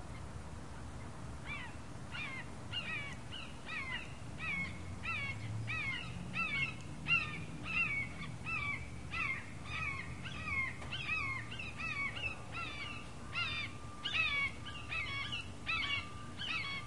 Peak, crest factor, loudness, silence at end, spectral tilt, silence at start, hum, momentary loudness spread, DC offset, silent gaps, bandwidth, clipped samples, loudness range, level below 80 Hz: -22 dBFS; 20 dB; -39 LUFS; 0 s; -4 dB/octave; 0 s; none; 13 LU; 0.3%; none; 11.5 kHz; under 0.1%; 6 LU; -56 dBFS